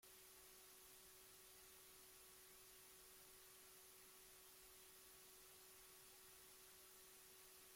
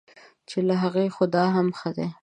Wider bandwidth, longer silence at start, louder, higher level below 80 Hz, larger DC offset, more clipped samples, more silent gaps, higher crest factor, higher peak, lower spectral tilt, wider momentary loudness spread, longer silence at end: first, 16.5 kHz vs 9.4 kHz; second, 0 s vs 0.5 s; second, -63 LUFS vs -24 LUFS; second, -84 dBFS vs -68 dBFS; neither; neither; neither; about the same, 12 dB vs 16 dB; second, -52 dBFS vs -8 dBFS; second, -0.5 dB/octave vs -7.5 dB/octave; second, 0 LU vs 8 LU; about the same, 0 s vs 0.1 s